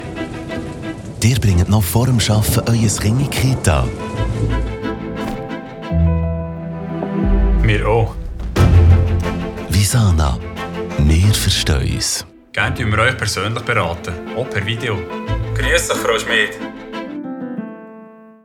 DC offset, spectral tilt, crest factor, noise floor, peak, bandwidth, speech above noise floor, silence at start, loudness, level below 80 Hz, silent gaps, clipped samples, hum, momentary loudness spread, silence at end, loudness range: under 0.1%; -5 dB/octave; 16 dB; -40 dBFS; 0 dBFS; 18.5 kHz; 24 dB; 0 s; -17 LUFS; -26 dBFS; none; under 0.1%; none; 13 LU; 0.15 s; 4 LU